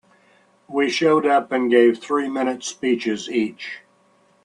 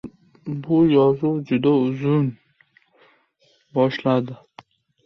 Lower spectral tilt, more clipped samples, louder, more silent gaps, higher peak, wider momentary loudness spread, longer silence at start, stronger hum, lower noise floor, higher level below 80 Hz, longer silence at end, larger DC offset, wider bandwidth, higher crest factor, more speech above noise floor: second, -4 dB/octave vs -9.5 dB/octave; neither; about the same, -20 LUFS vs -20 LUFS; neither; about the same, -4 dBFS vs -6 dBFS; second, 12 LU vs 17 LU; first, 0.7 s vs 0.05 s; neither; about the same, -59 dBFS vs -62 dBFS; second, -70 dBFS vs -60 dBFS; about the same, 0.65 s vs 0.7 s; neither; first, 10.5 kHz vs 6.2 kHz; about the same, 18 dB vs 16 dB; second, 39 dB vs 43 dB